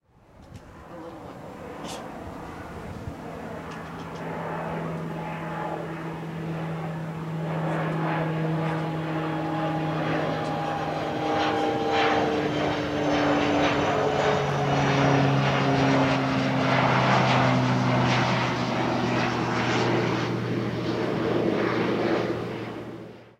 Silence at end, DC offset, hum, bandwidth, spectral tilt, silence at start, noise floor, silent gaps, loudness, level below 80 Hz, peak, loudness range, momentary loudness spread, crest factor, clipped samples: 0.1 s; under 0.1%; none; 12.5 kHz; -6 dB/octave; 0.4 s; -52 dBFS; none; -25 LUFS; -52 dBFS; -8 dBFS; 13 LU; 16 LU; 16 dB; under 0.1%